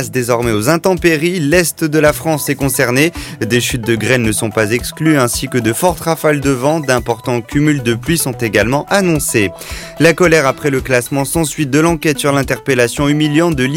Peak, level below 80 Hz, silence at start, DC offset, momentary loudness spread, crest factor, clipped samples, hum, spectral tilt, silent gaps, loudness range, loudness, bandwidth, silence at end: 0 dBFS; -34 dBFS; 0 s; under 0.1%; 4 LU; 14 dB; under 0.1%; none; -4.5 dB/octave; none; 1 LU; -13 LUFS; 17 kHz; 0 s